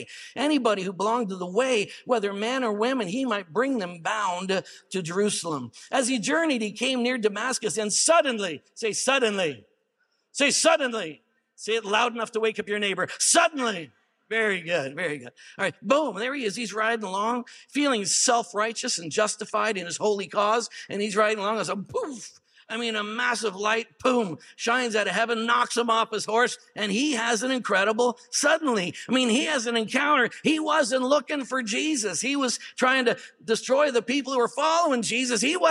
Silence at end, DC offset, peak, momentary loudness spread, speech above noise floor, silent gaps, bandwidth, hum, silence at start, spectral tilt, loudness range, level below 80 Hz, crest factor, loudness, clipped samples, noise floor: 0 s; under 0.1%; -6 dBFS; 8 LU; 47 dB; none; 15 kHz; none; 0 s; -2.5 dB/octave; 4 LU; -78 dBFS; 18 dB; -25 LUFS; under 0.1%; -73 dBFS